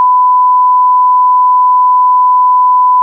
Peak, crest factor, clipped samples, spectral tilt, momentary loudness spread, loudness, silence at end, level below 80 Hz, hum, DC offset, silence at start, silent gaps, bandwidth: -4 dBFS; 4 dB; under 0.1%; -4 dB/octave; 0 LU; -7 LUFS; 0 s; under -90 dBFS; none; under 0.1%; 0 s; none; 1.1 kHz